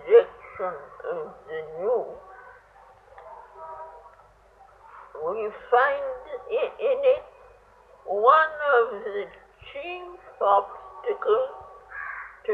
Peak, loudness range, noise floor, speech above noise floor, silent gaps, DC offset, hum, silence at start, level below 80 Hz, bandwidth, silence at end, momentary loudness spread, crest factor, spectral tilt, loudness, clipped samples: -4 dBFS; 11 LU; -55 dBFS; 30 dB; none; under 0.1%; none; 0 s; -64 dBFS; 4.6 kHz; 0 s; 24 LU; 22 dB; -5.5 dB/octave; -25 LUFS; under 0.1%